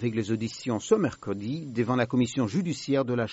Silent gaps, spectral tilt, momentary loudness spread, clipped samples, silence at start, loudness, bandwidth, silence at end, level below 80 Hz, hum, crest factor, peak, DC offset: none; -6 dB/octave; 7 LU; under 0.1%; 0 s; -28 LUFS; 8 kHz; 0 s; -62 dBFS; none; 18 dB; -8 dBFS; under 0.1%